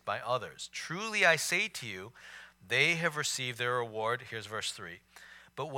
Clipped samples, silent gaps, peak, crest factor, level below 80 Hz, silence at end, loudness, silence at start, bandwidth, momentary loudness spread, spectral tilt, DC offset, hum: under 0.1%; none; -10 dBFS; 24 dB; -74 dBFS; 0 s; -31 LUFS; 0.05 s; 17.5 kHz; 22 LU; -2.5 dB/octave; under 0.1%; none